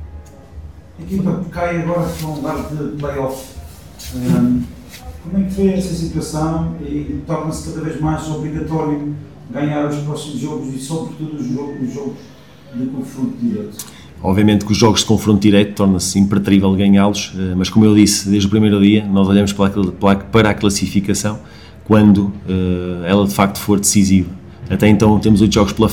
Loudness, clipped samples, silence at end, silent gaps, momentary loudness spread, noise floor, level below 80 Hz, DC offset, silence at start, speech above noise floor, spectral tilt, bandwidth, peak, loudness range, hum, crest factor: -16 LUFS; 0.1%; 0 s; none; 14 LU; -35 dBFS; -36 dBFS; 0.4%; 0 s; 20 dB; -5.5 dB/octave; 17 kHz; 0 dBFS; 10 LU; none; 16 dB